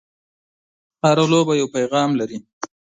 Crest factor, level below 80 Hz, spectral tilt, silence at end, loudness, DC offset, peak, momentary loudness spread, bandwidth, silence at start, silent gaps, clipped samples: 20 dB; -64 dBFS; -5.5 dB/octave; 0.25 s; -18 LUFS; under 0.1%; -2 dBFS; 14 LU; 9.6 kHz; 1.05 s; 2.53-2.61 s; under 0.1%